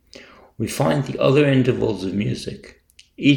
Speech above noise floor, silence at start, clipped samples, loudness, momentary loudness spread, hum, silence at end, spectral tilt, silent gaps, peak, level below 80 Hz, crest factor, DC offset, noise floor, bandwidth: 26 dB; 0.2 s; under 0.1%; -20 LUFS; 14 LU; none; 0 s; -6.5 dB/octave; none; -4 dBFS; -50 dBFS; 18 dB; under 0.1%; -45 dBFS; 19 kHz